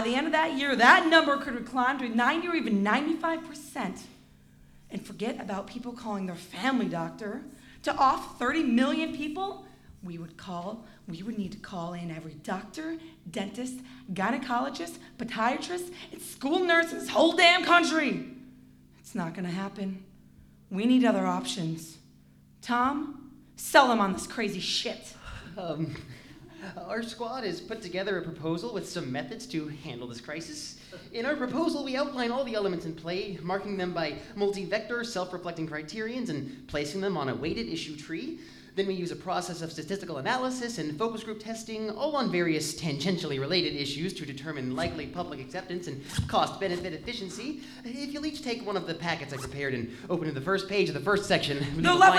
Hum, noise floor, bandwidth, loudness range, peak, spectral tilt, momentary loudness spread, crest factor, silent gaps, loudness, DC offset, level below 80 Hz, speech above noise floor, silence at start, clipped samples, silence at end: none; -57 dBFS; 15.5 kHz; 10 LU; -6 dBFS; -4.5 dB/octave; 16 LU; 24 dB; none; -29 LUFS; under 0.1%; -58 dBFS; 28 dB; 0 s; under 0.1%; 0 s